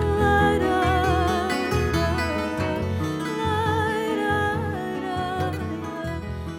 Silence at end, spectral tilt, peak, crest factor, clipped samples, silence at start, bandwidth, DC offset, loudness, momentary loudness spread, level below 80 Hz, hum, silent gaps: 0 s; -6 dB/octave; -8 dBFS; 16 dB; under 0.1%; 0 s; 16.5 kHz; under 0.1%; -24 LUFS; 9 LU; -36 dBFS; none; none